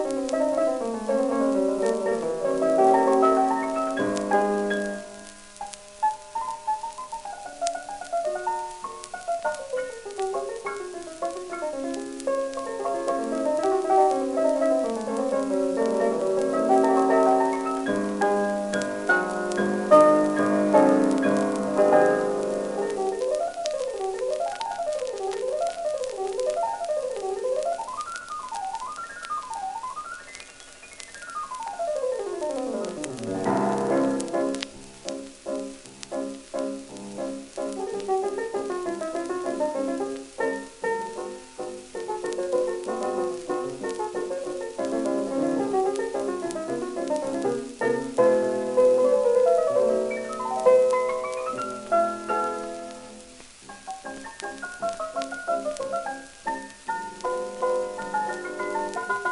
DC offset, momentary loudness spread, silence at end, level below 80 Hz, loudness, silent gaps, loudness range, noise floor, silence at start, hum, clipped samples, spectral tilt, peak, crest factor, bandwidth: under 0.1%; 15 LU; 0 s; -62 dBFS; -26 LUFS; none; 10 LU; -46 dBFS; 0 s; none; under 0.1%; -4.5 dB/octave; -4 dBFS; 22 dB; 11.5 kHz